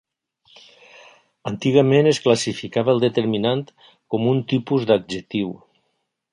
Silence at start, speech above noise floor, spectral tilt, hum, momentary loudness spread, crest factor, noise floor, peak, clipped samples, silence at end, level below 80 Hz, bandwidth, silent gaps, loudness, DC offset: 1.45 s; 54 dB; -6 dB/octave; none; 13 LU; 20 dB; -73 dBFS; -2 dBFS; under 0.1%; 0.75 s; -60 dBFS; 11.5 kHz; none; -20 LUFS; under 0.1%